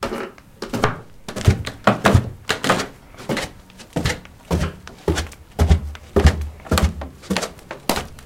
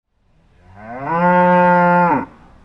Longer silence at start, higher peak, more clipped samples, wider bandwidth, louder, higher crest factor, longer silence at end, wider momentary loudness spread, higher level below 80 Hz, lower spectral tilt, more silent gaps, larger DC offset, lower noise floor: second, 0 s vs 0.8 s; about the same, 0 dBFS vs -2 dBFS; neither; first, 16.5 kHz vs 5.6 kHz; second, -22 LUFS vs -14 LUFS; first, 20 dB vs 14 dB; second, 0 s vs 0.4 s; second, 14 LU vs 19 LU; first, -28 dBFS vs -50 dBFS; second, -5 dB/octave vs -9.5 dB/octave; neither; neither; second, -42 dBFS vs -56 dBFS